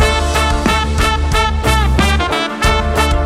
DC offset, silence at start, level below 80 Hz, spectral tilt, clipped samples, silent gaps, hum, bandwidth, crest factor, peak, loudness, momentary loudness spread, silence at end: under 0.1%; 0 s; -18 dBFS; -4.5 dB/octave; under 0.1%; none; none; 15 kHz; 12 dB; -2 dBFS; -14 LUFS; 2 LU; 0 s